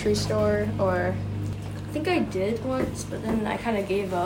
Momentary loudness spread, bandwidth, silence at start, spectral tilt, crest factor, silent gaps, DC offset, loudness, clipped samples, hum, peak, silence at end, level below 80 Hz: 8 LU; 16.5 kHz; 0 s; -6 dB/octave; 12 dB; none; under 0.1%; -27 LUFS; under 0.1%; 50 Hz at -40 dBFS; -14 dBFS; 0 s; -44 dBFS